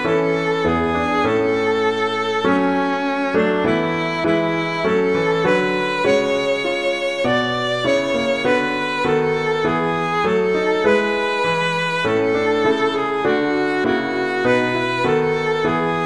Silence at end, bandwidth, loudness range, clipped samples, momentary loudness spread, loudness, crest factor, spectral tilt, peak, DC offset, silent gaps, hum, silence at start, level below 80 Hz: 0 s; 11 kHz; 1 LU; under 0.1%; 3 LU; -18 LUFS; 14 dB; -5.5 dB/octave; -4 dBFS; 0.3%; none; none; 0 s; -50 dBFS